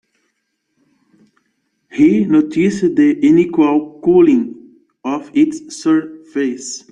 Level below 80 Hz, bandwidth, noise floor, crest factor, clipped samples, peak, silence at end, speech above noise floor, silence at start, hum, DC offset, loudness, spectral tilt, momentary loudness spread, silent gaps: -56 dBFS; 9.6 kHz; -70 dBFS; 14 dB; under 0.1%; -2 dBFS; 0.15 s; 56 dB; 1.95 s; none; under 0.1%; -14 LUFS; -6.5 dB/octave; 13 LU; none